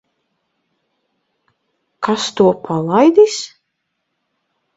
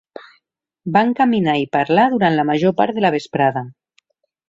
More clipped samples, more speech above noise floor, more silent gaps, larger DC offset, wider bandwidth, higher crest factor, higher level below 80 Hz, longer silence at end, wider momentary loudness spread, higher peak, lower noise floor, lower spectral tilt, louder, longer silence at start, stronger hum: neither; first, 59 dB vs 50 dB; neither; neither; about the same, 8 kHz vs 7.8 kHz; about the same, 18 dB vs 16 dB; about the same, -60 dBFS vs -60 dBFS; first, 1.3 s vs 0.8 s; first, 14 LU vs 4 LU; about the same, 0 dBFS vs -2 dBFS; first, -73 dBFS vs -66 dBFS; second, -5 dB/octave vs -7 dB/octave; first, -14 LUFS vs -17 LUFS; first, 2 s vs 0.85 s; neither